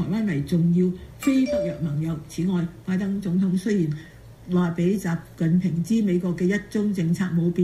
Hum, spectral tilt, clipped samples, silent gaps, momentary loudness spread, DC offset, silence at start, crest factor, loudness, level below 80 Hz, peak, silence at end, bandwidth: none; -8 dB/octave; under 0.1%; none; 6 LU; under 0.1%; 0 s; 14 dB; -24 LUFS; -50 dBFS; -10 dBFS; 0 s; 13.5 kHz